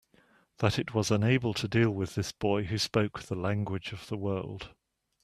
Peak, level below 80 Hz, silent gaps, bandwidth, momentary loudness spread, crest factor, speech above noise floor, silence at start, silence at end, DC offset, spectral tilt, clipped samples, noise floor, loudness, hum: -8 dBFS; -58 dBFS; none; 14 kHz; 10 LU; 22 dB; 35 dB; 0.6 s; 0.55 s; under 0.1%; -5.5 dB/octave; under 0.1%; -65 dBFS; -30 LUFS; none